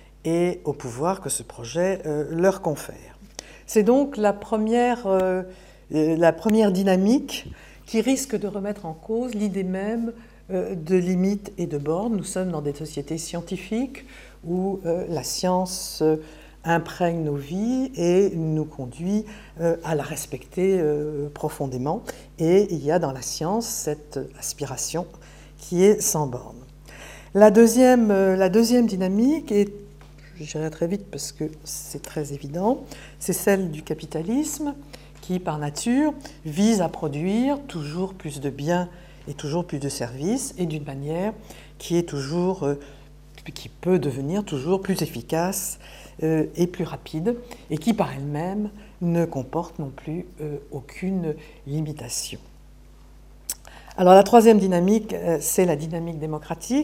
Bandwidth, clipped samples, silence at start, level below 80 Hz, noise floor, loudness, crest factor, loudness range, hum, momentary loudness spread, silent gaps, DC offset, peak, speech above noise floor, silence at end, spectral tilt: 16.5 kHz; under 0.1%; 0.25 s; -48 dBFS; -48 dBFS; -23 LUFS; 24 dB; 9 LU; none; 14 LU; none; under 0.1%; 0 dBFS; 25 dB; 0 s; -5.5 dB/octave